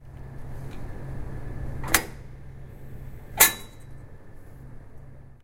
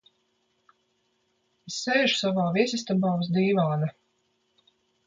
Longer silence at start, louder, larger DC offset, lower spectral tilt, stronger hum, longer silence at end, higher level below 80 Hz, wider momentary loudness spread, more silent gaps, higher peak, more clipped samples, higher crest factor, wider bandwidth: second, 0 s vs 1.65 s; about the same, -23 LUFS vs -25 LUFS; neither; second, -1.5 dB/octave vs -5.5 dB/octave; neither; second, 0 s vs 1.15 s; first, -40 dBFS vs -70 dBFS; first, 29 LU vs 9 LU; neither; first, 0 dBFS vs -8 dBFS; neither; first, 30 dB vs 20 dB; first, 16 kHz vs 9 kHz